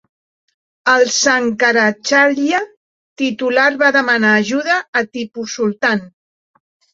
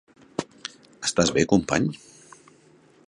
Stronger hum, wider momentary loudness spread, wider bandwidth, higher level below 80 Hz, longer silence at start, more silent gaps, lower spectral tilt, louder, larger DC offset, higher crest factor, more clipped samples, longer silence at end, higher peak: neither; second, 9 LU vs 18 LU; second, 8 kHz vs 11.5 kHz; second, -64 dBFS vs -52 dBFS; first, 0.85 s vs 0.4 s; first, 2.77-3.16 s, 4.88-4.93 s vs none; second, -3 dB/octave vs -4.5 dB/octave; first, -14 LUFS vs -24 LUFS; neither; second, 16 dB vs 22 dB; neither; second, 0.85 s vs 1.15 s; first, 0 dBFS vs -4 dBFS